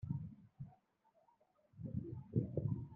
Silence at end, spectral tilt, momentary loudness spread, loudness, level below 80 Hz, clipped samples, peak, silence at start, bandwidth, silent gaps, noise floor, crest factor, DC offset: 0 s; -14 dB/octave; 16 LU; -44 LUFS; -66 dBFS; under 0.1%; -24 dBFS; 0 s; 2.4 kHz; none; -76 dBFS; 22 dB; under 0.1%